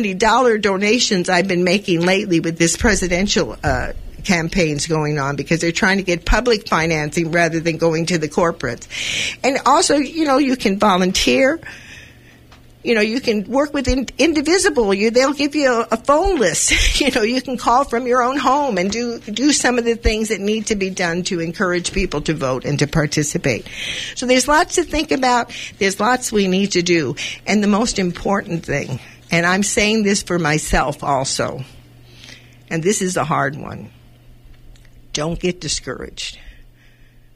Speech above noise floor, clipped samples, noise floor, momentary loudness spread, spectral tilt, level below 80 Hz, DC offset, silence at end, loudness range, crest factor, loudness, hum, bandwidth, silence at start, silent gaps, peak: 29 dB; under 0.1%; -47 dBFS; 9 LU; -4 dB/octave; -34 dBFS; under 0.1%; 0.75 s; 6 LU; 16 dB; -17 LUFS; none; 15.5 kHz; 0 s; none; -2 dBFS